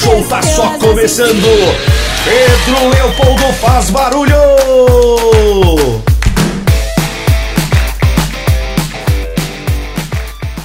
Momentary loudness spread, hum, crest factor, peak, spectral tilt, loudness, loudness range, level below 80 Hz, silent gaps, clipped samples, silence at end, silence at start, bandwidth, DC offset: 10 LU; none; 10 dB; 0 dBFS; -5 dB/octave; -10 LUFS; 5 LU; -16 dBFS; none; 0.4%; 0 s; 0 s; 16.5 kHz; under 0.1%